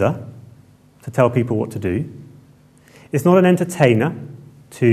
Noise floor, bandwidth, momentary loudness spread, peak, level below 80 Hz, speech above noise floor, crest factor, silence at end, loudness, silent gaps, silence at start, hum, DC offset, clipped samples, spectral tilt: -49 dBFS; 14 kHz; 20 LU; 0 dBFS; -56 dBFS; 33 dB; 18 dB; 0 s; -18 LUFS; none; 0 s; none; under 0.1%; under 0.1%; -7.5 dB/octave